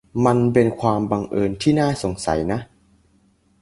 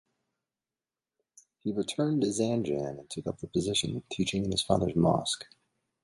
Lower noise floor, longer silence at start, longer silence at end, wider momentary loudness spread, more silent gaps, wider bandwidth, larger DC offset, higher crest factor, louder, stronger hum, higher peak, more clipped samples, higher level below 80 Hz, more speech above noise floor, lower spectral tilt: second, -59 dBFS vs under -90 dBFS; second, 0.15 s vs 1.65 s; first, 0.95 s vs 0.6 s; second, 7 LU vs 11 LU; neither; about the same, 11.5 kHz vs 11.5 kHz; neither; about the same, 20 dB vs 22 dB; first, -20 LUFS vs -30 LUFS; neither; first, -2 dBFS vs -10 dBFS; neither; first, -44 dBFS vs -56 dBFS; second, 40 dB vs over 60 dB; first, -6.5 dB/octave vs -5 dB/octave